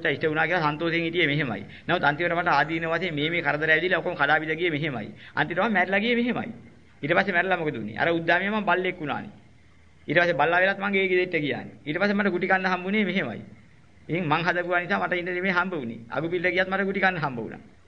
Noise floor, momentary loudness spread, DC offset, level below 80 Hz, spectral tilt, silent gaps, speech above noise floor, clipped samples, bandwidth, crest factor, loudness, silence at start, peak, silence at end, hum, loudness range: -56 dBFS; 10 LU; 0.2%; -60 dBFS; -7 dB/octave; none; 31 dB; under 0.1%; 7.2 kHz; 20 dB; -24 LUFS; 0 s; -6 dBFS; 0.25 s; none; 2 LU